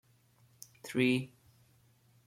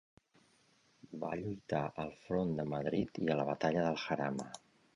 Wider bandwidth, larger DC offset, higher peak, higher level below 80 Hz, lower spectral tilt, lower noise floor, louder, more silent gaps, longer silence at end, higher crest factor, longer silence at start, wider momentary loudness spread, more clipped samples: first, 16.5 kHz vs 11 kHz; neither; about the same, -16 dBFS vs -18 dBFS; second, -74 dBFS vs -66 dBFS; about the same, -5.5 dB/octave vs -6.5 dB/octave; second, -67 dBFS vs -71 dBFS; first, -32 LUFS vs -37 LUFS; neither; first, 1 s vs 0.4 s; about the same, 22 dB vs 20 dB; second, 0.85 s vs 1.05 s; first, 25 LU vs 11 LU; neither